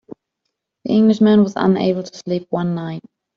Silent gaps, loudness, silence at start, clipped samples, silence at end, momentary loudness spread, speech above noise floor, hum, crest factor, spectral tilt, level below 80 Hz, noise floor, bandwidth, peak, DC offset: none; -17 LUFS; 0.85 s; under 0.1%; 0.4 s; 15 LU; 61 dB; none; 14 dB; -7.5 dB/octave; -60 dBFS; -77 dBFS; 7.2 kHz; -4 dBFS; under 0.1%